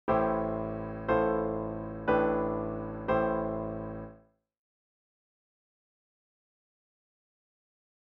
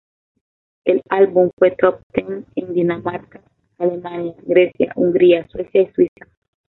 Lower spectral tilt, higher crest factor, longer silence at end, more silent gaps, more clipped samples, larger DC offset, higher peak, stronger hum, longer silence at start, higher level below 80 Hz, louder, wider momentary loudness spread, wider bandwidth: second, -6.5 dB/octave vs -10 dB/octave; about the same, 18 dB vs 16 dB; first, 3.85 s vs 0.7 s; second, none vs 1.53-1.57 s, 2.03-2.10 s; neither; neither; second, -16 dBFS vs -2 dBFS; neither; second, 0.05 s vs 0.85 s; about the same, -52 dBFS vs -56 dBFS; second, -31 LUFS vs -17 LUFS; about the same, 10 LU vs 12 LU; first, 5.4 kHz vs 4.1 kHz